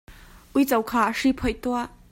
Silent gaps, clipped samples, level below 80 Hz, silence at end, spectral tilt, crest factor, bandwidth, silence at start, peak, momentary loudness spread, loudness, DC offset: none; under 0.1%; -44 dBFS; 0.25 s; -4.5 dB/octave; 16 dB; 16.5 kHz; 0.1 s; -8 dBFS; 6 LU; -24 LUFS; under 0.1%